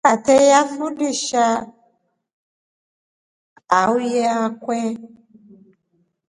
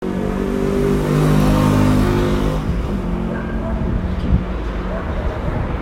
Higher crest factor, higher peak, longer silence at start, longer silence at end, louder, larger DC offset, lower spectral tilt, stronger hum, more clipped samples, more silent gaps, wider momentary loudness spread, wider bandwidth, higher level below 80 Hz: first, 20 dB vs 14 dB; about the same, 0 dBFS vs -2 dBFS; about the same, 0.05 s vs 0 s; first, 1.25 s vs 0 s; about the same, -18 LUFS vs -19 LUFS; neither; second, -3 dB/octave vs -7.5 dB/octave; neither; neither; first, 2.33-3.56 s vs none; first, 12 LU vs 9 LU; second, 11.5 kHz vs 16 kHz; second, -64 dBFS vs -24 dBFS